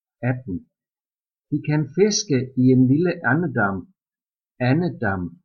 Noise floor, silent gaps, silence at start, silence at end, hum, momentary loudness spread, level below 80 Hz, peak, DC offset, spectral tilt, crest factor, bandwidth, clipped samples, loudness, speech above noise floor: under -90 dBFS; none; 0.2 s; 0.15 s; none; 12 LU; -58 dBFS; -6 dBFS; under 0.1%; -6 dB/octave; 16 dB; 7.2 kHz; under 0.1%; -21 LUFS; over 70 dB